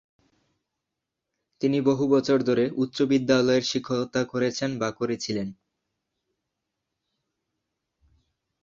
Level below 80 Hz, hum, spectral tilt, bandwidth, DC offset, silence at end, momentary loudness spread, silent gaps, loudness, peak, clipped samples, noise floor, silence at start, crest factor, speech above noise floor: -64 dBFS; none; -5.5 dB/octave; 7.6 kHz; under 0.1%; 3.1 s; 8 LU; none; -25 LUFS; -6 dBFS; under 0.1%; -85 dBFS; 1.6 s; 20 dB; 61 dB